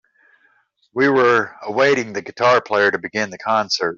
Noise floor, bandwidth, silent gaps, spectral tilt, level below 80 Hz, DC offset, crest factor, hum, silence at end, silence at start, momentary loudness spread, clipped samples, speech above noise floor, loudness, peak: -60 dBFS; 7.4 kHz; none; -4 dB/octave; -66 dBFS; under 0.1%; 16 dB; none; 0 s; 0.95 s; 9 LU; under 0.1%; 42 dB; -18 LUFS; -2 dBFS